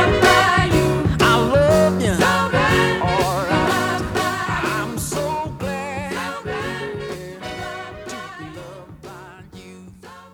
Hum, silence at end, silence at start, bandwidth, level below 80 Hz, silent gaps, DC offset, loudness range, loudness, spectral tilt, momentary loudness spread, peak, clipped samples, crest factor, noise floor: none; 0.05 s; 0 s; over 20 kHz; -36 dBFS; none; under 0.1%; 15 LU; -18 LUFS; -5 dB/octave; 20 LU; -2 dBFS; under 0.1%; 18 dB; -41 dBFS